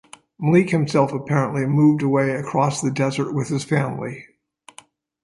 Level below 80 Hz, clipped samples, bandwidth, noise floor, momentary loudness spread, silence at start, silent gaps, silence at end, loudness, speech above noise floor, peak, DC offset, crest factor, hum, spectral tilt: -60 dBFS; under 0.1%; 11.5 kHz; -50 dBFS; 9 LU; 0.4 s; none; 1 s; -20 LUFS; 31 dB; -2 dBFS; under 0.1%; 18 dB; none; -7 dB/octave